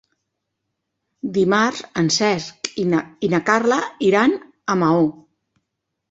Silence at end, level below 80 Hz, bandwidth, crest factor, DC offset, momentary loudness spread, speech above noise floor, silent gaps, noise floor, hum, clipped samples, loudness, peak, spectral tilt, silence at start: 1 s; -62 dBFS; 8 kHz; 18 dB; under 0.1%; 8 LU; 60 dB; none; -78 dBFS; none; under 0.1%; -19 LUFS; -2 dBFS; -4.5 dB/octave; 1.25 s